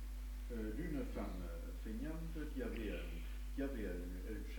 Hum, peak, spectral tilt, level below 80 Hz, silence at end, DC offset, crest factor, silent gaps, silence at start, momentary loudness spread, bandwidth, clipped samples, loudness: none; -32 dBFS; -6.5 dB/octave; -46 dBFS; 0 s; under 0.1%; 12 dB; none; 0 s; 5 LU; 19 kHz; under 0.1%; -46 LUFS